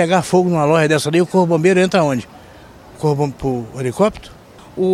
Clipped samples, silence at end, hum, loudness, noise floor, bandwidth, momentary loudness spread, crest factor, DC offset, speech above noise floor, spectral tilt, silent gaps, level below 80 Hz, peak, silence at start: under 0.1%; 0 s; none; -16 LUFS; -41 dBFS; 14.5 kHz; 9 LU; 16 dB; under 0.1%; 25 dB; -6 dB/octave; none; -46 dBFS; -2 dBFS; 0 s